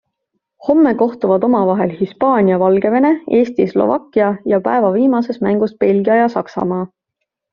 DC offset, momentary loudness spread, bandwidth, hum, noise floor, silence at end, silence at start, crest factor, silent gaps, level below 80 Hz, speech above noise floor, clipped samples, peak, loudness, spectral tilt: under 0.1%; 7 LU; 6.8 kHz; none; -77 dBFS; 0.65 s; 0.6 s; 12 dB; none; -56 dBFS; 63 dB; under 0.1%; -2 dBFS; -15 LUFS; -7 dB/octave